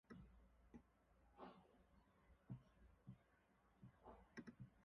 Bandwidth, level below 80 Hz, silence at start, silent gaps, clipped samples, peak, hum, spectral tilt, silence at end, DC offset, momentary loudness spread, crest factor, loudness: 5.6 kHz; -76 dBFS; 0.05 s; none; under 0.1%; -44 dBFS; none; -6.5 dB/octave; 0 s; under 0.1%; 7 LU; 20 dB; -65 LUFS